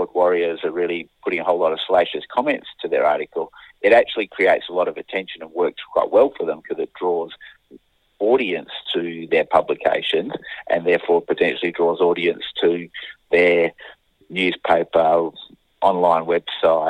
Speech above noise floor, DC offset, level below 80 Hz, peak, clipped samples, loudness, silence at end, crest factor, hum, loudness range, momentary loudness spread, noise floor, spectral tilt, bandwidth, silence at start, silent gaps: 30 dB; under 0.1%; -60 dBFS; -2 dBFS; under 0.1%; -20 LUFS; 0 s; 18 dB; none; 3 LU; 11 LU; -50 dBFS; -6 dB/octave; 9.4 kHz; 0 s; none